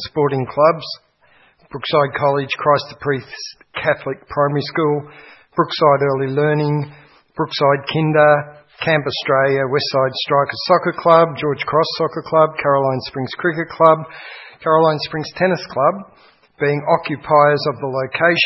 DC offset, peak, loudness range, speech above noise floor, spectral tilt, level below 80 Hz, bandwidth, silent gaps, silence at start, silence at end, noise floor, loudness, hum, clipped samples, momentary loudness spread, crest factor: under 0.1%; 0 dBFS; 3 LU; 37 dB; -7 dB/octave; -58 dBFS; 6 kHz; none; 0 s; 0 s; -54 dBFS; -17 LUFS; none; under 0.1%; 12 LU; 18 dB